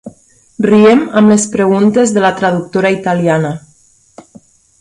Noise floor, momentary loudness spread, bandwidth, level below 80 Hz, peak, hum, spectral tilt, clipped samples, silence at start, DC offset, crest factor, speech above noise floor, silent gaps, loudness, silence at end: -49 dBFS; 8 LU; 11.5 kHz; -52 dBFS; 0 dBFS; none; -5.5 dB/octave; under 0.1%; 0.05 s; under 0.1%; 12 dB; 39 dB; none; -11 LUFS; 1.2 s